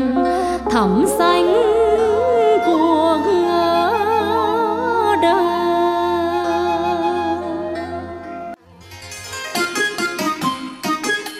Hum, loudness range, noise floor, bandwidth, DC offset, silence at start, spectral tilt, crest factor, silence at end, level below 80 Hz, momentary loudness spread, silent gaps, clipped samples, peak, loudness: none; 8 LU; -40 dBFS; 16 kHz; under 0.1%; 0 s; -4.5 dB/octave; 14 dB; 0 s; -46 dBFS; 13 LU; none; under 0.1%; -4 dBFS; -17 LUFS